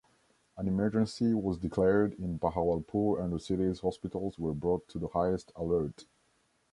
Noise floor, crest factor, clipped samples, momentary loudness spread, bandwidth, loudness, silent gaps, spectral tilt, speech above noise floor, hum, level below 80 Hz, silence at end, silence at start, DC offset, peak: -72 dBFS; 18 dB; under 0.1%; 6 LU; 11.5 kHz; -32 LUFS; none; -8 dB/octave; 41 dB; none; -52 dBFS; 0.7 s; 0.55 s; under 0.1%; -14 dBFS